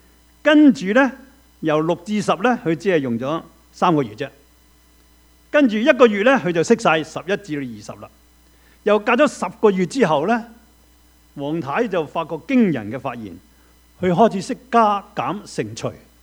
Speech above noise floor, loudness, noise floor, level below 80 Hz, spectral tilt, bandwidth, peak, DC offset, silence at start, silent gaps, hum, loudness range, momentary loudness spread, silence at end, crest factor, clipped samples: 35 dB; -19 LUFS; -53 dBFS; -56 dBFS; -6 dB/octave; 16 kHz; 0 dBFS; under 0.1%; 0.45 s; none; none; 4 LU; 14 LU; 0.3 s; 20 dB; under 0.1%